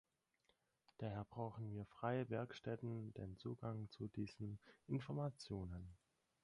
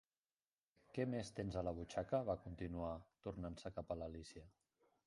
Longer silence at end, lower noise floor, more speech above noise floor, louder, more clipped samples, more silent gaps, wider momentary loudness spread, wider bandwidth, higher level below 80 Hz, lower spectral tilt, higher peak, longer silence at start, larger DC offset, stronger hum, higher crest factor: second, 0.45 s vs 0.6 s; second, -83 dBFS vs under -90 dBFS; second, 36 dB vs over 44 dB; second, -49 LUFS vs -46 LUFS; neither; neither; about the same, 8 LU vs 10 LU; about the same, 11 kHz vs 11 kHz; second, -68 dBFS vs -62 dBFS; first, -8 dB/octave vs -6.5 dB/octave; about the same, -28 dBFS vs -28 dBFS; about the same, 1 s vs 0.9 s; neither; neither; about the same, 20 dB vs 20 dB